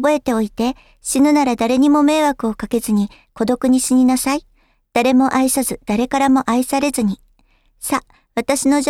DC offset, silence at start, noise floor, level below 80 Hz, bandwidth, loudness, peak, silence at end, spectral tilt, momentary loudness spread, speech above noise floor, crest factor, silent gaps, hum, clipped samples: under 0.1%; 0 s; -56 dBFS; -46 dBFS; 16 kHz; -17 LUFS; 0 dBFS; 0 s; -4 dB/octave; 9 LU; 40 dB; 16 dB; none; none; under 0.1%